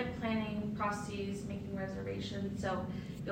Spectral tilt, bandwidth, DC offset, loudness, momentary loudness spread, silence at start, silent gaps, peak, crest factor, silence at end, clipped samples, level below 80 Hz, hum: -6.5 dB/octave; 16 kHz; under 0.1%; -39 LUFS; 5 LU; 0 s; none; -22 dBFS; 16 dB; 0 s; under 0.1%; -58 dBFS; none